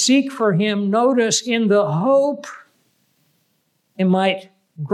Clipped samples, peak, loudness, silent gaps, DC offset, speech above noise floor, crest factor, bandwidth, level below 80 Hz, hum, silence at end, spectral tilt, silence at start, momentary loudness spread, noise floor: under 0.1%; -6 dBFS; -18 LUFS; none; under 0.1%; 50 dB; 12 dB; 13 kHz; -82 dBFS; none; 0 s; -4.5 dB/octave; 0 s; 11 LU; -67 dBFS